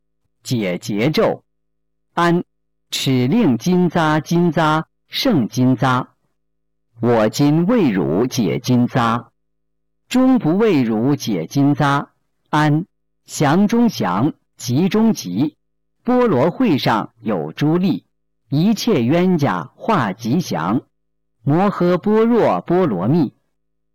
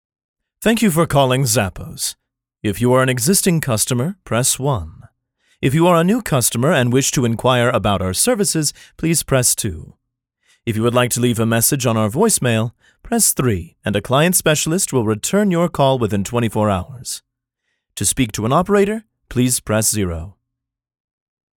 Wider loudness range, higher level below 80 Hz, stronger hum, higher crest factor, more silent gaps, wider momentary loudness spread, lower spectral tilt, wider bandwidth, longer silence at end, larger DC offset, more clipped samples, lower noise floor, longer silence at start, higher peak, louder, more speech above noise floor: about the same, 1 LU vs 3 LU; second, -52 dBFS vs -42 dBFS; neither; second, 8 dB vs 16 dB; neither; about the same, 8 LU vs 10 LU; first, -6.5 dB/octave vs -4.5 dB/octave; second, 17 kHz vs 19 kHz; second, 0.65 s vs 1.25 s; neither; neither; about the same, -76 dBFS vs -78 dBFS; second, 0.45 s vs 0.6 s; second, -8 dBFS vs -2 dBFS; about the same, -17 LUFS vs -17 LUFS; about the same, 60 dB vs 61 dB